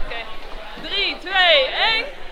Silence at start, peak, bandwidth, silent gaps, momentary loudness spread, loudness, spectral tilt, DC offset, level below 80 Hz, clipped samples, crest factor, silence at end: 0 s; -2 dBFS; 11.5 kHz; none; 21 LU; -17 LUFS; -2.5 dB/octave; under 0.1%; -36 dBFS; under 0.1%; 18 dB; 0 s